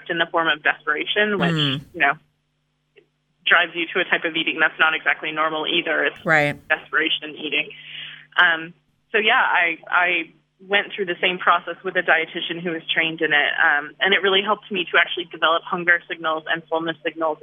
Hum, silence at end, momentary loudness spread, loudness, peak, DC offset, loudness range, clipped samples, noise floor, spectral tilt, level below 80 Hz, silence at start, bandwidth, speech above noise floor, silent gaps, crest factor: none; 0.05 s; 8 LU; -20 LUFS; -2 dBFS; under 0.1%; 2 LU; under 0.1%; -70 dBFS; -5 dB/octave; -68 dBFS; 0 s; 13 kHz; 49 dB; none; 20 dB